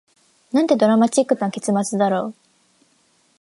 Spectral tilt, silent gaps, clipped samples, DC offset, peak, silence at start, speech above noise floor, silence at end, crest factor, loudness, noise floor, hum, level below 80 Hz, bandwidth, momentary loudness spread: -5.5 dB/octave; none; under 0.1%; under 0.1%; -4 dBFS; 0.55 s; 43 dB; 1.1 s; 18 dB; -19 LUFS; -61 dBFS; none; -74 dBFS; 11.5 kHz; 8 LU